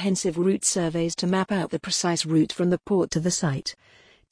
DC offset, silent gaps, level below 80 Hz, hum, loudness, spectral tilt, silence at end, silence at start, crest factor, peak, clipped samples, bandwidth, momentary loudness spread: under 0.1%; none; -56 dBFS; none; -24 LUFS; -4.5 dB/octave; 0.6 s; 0 s; 16 dB; -10 dBFS; under 0.1%; 10.5 kHz; 4 LU